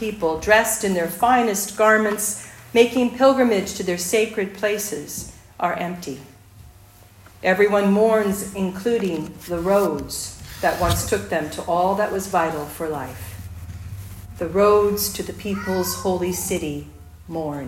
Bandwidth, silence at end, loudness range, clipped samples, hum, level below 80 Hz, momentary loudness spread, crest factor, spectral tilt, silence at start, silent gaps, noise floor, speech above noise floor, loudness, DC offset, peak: 16.5 kHz; 0 s; 6 LU; under 0.1%; none; -46 dBFS; 16 LU; 20 dB; -4 dB/octave; 0 s; none; -48 dBFS; 27 dB; -21 LUFS; under 0.1%; -2 dBFS